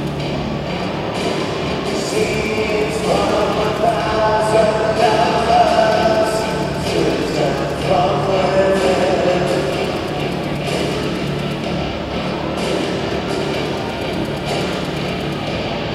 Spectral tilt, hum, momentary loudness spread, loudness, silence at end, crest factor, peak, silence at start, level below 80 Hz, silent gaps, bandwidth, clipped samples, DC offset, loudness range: -5.5 dB/octave; none; 7 LU; -18 LUFS; 0 s; 16 dB; -2 dBFS; 0 s; -36 dBFS; none; 15.5 kHz; under 0.1%; under 0.1%; 6 LU